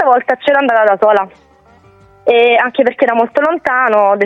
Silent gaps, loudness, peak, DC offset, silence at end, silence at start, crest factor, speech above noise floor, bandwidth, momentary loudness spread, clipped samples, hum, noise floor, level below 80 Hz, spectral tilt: none; -11 LUFS; 0 dBFS; under 0.1%; 0 s; 0 s; 12 dB; 34 dB; 6.6 kHz; 4 LU; under 0.1%; none; -45 dBFS; -58 dBFS; -5.5 dB/octave